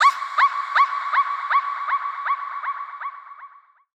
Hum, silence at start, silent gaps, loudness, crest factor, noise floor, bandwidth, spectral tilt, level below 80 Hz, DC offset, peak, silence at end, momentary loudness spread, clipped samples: none; 0 s; none; -22 LUFS; 16 dB; -47 dBFS; 9.6 kHz; 4 dB/octave; under -90 dBFS; under 0.1%; -6 dBFS; 0.5 s; 15 LU; under 0.1%